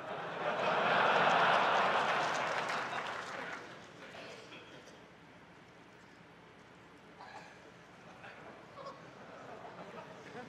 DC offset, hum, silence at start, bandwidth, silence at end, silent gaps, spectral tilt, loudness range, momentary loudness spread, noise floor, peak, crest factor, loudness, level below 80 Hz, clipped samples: under 0.1%; none; 0 s; 14 kHz; 0 s; none; -3.5 dB/octave; 23 LU; 26 LU; -57 dBFS; -14 dBFS; 22 dB; -32 LUFS; -78 dBFS; under 0.1%